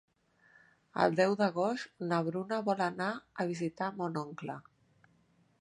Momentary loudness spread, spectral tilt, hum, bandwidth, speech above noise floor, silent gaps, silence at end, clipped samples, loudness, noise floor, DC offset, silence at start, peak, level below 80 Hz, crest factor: 13 LU; -6.5 dB/octave; none; 11 kHz; 36 dB; none; 1 s; under 0.1%; -34 LUFS; -69 dBFS; under 0.1%; 0.95 s; -12 dBFS; -78 dBFS; 24 dB